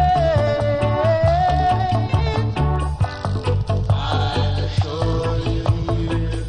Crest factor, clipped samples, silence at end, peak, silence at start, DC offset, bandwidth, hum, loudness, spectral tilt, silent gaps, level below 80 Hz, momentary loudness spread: 14 dB; under 0.1%; 0 s; -6 dBFS; 0 s; under 0.1%; 10 kHz; none; -20 LUFS; -7.5 dB/octave; none; -26 dBFS; 5 LU